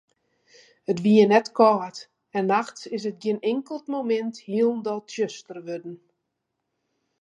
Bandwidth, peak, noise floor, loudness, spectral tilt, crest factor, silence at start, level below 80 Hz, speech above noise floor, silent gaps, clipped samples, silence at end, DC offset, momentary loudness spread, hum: 9 kHz; -4 dBFS; -80 dBFS; -23 LUFS; -6 dB/octave; 20 dB; 0.9 s; -76 dBFS; 57 dB; none; under 0.1%; 1.25 s; under 0.1%; 18 LU; none